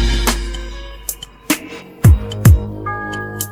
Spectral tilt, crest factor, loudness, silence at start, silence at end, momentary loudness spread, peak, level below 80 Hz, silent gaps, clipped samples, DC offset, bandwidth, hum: -5 dB/octave; 16 dB; -17 LUFS; 0 s; 0 s; 16 LU; 0 dBFS; -20 dBFS; none; under 0.1%; under 0.1%; 16.5 kHz; none